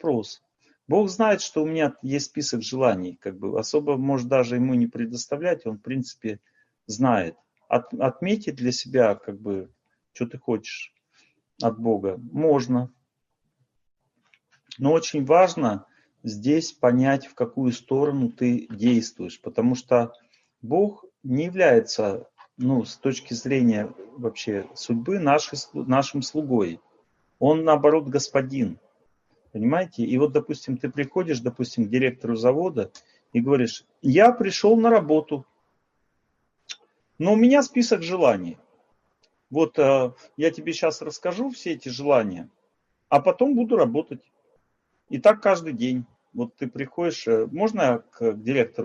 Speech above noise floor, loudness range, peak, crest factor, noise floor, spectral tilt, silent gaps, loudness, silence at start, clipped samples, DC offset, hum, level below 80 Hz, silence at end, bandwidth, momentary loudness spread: 54 dB; 5 LU; -4 dBFS; 20 dB; -76 dBFS; -6 dB/octave; none; -23 LUFS; 0.05 s; under 0.1%; under 0.1%; none; -68 dBFS; 0 s; 7.6 kHz; 14 LU